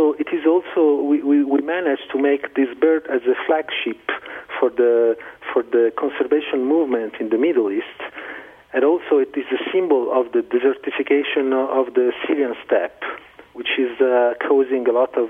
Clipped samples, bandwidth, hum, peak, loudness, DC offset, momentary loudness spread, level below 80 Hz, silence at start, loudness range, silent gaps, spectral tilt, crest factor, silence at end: under 0.1%; 3.8 kHz; none; -4 dBFS; -19 LUFS; under 0.1%; 10 LU; -66 dBFS; 0 s; 2 LU; none; -6.5 dB/octave; 16 dB; 0 s